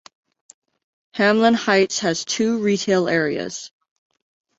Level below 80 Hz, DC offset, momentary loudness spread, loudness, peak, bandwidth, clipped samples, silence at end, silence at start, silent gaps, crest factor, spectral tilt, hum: -64 dBFS; under 0.1%; 15 LU; -19 LUFS; -2 dBFS; 8 kHz; under 0.1%; 0.9 s; 1.15 s; none; 18 dB; -4 dB/octave; none